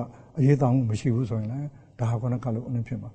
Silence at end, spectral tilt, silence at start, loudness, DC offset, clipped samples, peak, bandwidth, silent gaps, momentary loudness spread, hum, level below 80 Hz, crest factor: 0 s; -9 dB/octave; 0 s; -26 LUFS; under 0.1%; under 0.1%; -8 dBFS; 8.4 kHz; none; 12 LU; none; -54 dBFS; 18 dB